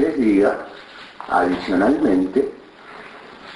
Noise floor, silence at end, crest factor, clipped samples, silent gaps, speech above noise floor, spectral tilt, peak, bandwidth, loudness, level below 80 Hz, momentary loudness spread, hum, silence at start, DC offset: -40 dBFS; 0 s; 16 dB; under 0.1%; none; 22 dB; -7 dB/octave; -4 dBFS; 10.5 kHz; -19 LUFS; -50 dBFS; 22 LU; none; 0 s; under 0.1%